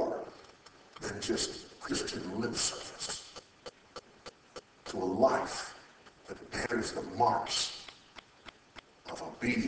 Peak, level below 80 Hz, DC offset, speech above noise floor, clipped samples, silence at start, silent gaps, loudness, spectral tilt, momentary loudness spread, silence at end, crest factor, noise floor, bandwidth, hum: -12 dBFS; -62 dBFS; under 0.1%; 25 dB; under 0.1%; 0 s; none; -34 LUFS; -3 dB/octave; 23 LU; 0 s; 24 dB; -57 dBFS; 8 kHz; none